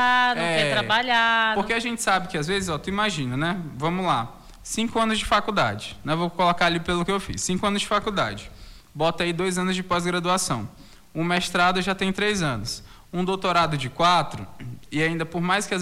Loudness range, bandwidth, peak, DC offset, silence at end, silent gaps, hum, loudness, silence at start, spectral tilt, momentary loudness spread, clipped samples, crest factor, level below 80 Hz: 3 LU; 16 kHz; -10 dBFS; under 0.1%; 0 s; none; none; -23 LUFS; 0 s; -4 dB/octave; 11 LU; under 0.1%; 14 dB; -46 dBFS